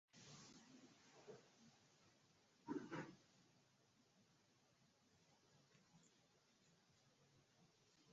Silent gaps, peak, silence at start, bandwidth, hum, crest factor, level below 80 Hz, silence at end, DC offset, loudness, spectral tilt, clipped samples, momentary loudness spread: none; -38 dBFS; 0.15 s; 7.4 kHz; none; 26 dB; under -90 dBFS; 0 s; under 0.1%; -58 LUFS; -4.5 dB/octave; under 0.1%; 16 LU